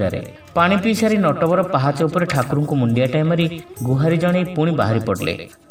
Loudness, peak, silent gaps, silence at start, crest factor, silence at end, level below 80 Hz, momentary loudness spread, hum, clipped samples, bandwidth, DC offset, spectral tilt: -18 LUFS; 0 dBFS; none; 0 s; 18 dB; 0.25 s; -50 dBFS; 7 LU; none; under 0.1%; 16.5 kHz; under 0.1%; -7 dB/octave